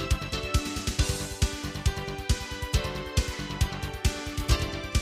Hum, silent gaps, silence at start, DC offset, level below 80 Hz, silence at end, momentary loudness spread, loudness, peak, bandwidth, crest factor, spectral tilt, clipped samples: none; none; 0 s; under 0.1%; -32 dBFS; 0 s; 3 LU; -30 LUFS; -10 dBFS; 15.5 kHz; 18 dB; -4 dB/octave; under 0.1%